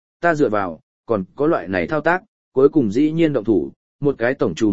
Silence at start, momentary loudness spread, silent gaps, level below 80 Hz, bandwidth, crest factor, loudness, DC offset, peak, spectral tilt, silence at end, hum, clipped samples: 0.2 s; 8 LU; 0.83-1.04 s, 2.28-2.52 s, 3.76-3.99 s; -52 dBFS; 7.8 kHz; 18 dB; -19 LUFS; 0.9%; -2 dBFS; -7.5 dB/octave; 0 s; none; under 0.1%